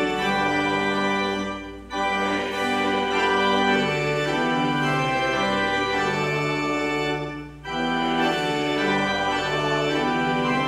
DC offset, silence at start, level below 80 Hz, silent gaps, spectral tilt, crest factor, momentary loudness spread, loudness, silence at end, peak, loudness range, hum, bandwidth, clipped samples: under 0.1%; 0 s; -48 dBFS; none; -4.5 dB/octave; 16 dB; 6 LU; -23 LUFS; 0 s; -8 dBFS; 2 LU; none; 15 kHz; under 0.1%